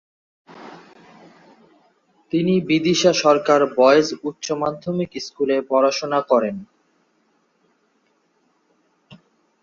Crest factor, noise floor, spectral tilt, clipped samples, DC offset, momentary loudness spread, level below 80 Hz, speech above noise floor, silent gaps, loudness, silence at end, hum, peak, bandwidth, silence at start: 20 dB; -65 dBFS; -5 dB/octave; under 0.1%; under 0.1%; 13 LU; -64 dBFS; 47 dB; none; -19 LUFS; 0.45 s; none; -2 dBFS; 7.4 kHz; 0.5 s